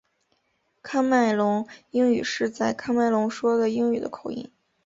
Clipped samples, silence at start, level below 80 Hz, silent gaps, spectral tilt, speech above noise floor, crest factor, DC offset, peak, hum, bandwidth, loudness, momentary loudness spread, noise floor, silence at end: under 0.1%; 0.85 s; -66 dBFS; none; -5 dB/octave; 48 dB; 14 dB; under 0.1%; -10 dBFS; none; 7.8 kHz; -24 LUFS; 12 LU; -71 dBFS; 0.4 s